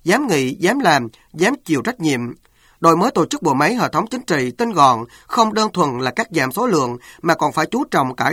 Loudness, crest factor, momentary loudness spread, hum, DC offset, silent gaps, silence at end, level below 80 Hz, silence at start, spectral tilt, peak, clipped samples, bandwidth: -18 LUFS; 18 dB; 7 LU; none; under 0.1%; none; 0 s; -56 dBFS; 0.05 s; -4.5 dB/octave; 0 dBFS; under 0.1%; 17 kHz